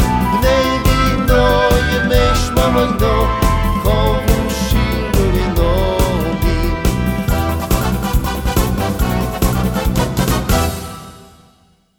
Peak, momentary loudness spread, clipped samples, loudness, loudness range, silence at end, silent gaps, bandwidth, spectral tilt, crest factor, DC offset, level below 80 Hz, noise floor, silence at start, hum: 0 dBFS; 4 LU; under 0.1%; -15 LUFS; 4 LU; 0.75 s; none; over 20 kHz; -5.5 dB/octave; 14 dB; under 0.1%; -20 dBFS; -53 dBFS; 0 s; none